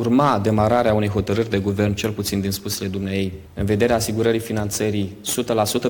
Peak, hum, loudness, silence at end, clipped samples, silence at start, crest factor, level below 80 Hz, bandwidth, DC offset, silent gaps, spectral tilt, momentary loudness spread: -4 dBFS; none; -21 LUFS; 0 s; under 0.1%; 0 s; 16 dB; -42 dBFS; 17.5 kHz; under 0.1%; none; -5.5 dB/octave; 7 LU